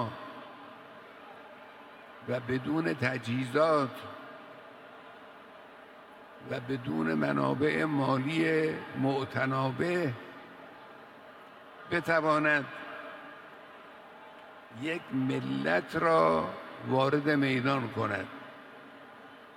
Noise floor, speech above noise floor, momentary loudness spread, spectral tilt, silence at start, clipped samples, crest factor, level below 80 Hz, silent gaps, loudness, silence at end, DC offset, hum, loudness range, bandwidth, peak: -51 dBFS; 22 dB; 23 LU; -7 dB/octave; 0 s; under 0.1%; 20 dB; -70 dBFS; none; -30 LUFS; 0 s; under 0.1%; none; 7 LU; 15 kHz; -12 dBFS